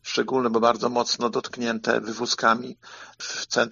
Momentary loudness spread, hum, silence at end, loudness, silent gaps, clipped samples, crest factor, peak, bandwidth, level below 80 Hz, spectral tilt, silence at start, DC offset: 14 LU; none; 0 s; -24 LUFS; none; under 0.1%; 20 dB; -4 dBFS; 7.4 kHz; -70 dBFS; -1.5 dB/octave; 0.05 s; under 0.1%